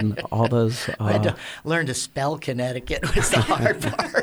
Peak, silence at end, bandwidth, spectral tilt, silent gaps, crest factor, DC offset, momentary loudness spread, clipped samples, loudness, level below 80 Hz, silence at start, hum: -6 dBFS; 0 s; over 20 kHz; -5 dB/octave; none; 16 dB; under 0.1%; 6 LU; under 0.1%; -23 LUFS; -36 dBFS; 0 s; none